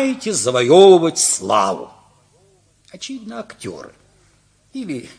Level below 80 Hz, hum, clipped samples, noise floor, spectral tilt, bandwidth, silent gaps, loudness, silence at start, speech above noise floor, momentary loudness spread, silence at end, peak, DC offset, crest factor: -62 dBFS; 50 Hz at -60 dBFS; under 0.1%; -56 dBFS; -3.5 dB/octave; 10.5 kHz; none; -13 LUFS; 0 s; 40 dB; 23 LU; 0.1 s; 0 dBFS; under 0.1%; 18 dB